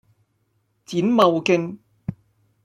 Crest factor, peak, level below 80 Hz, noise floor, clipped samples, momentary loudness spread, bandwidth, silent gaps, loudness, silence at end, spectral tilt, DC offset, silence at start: 20 dB; -2 dBFS; -58 dBFS; -69 dBFS; under 0.1%; 18 LU; 14.5 kHz; none; -19 LUFS; 0.5 s; -6 dB/octave; under 0.1%; 0.9 s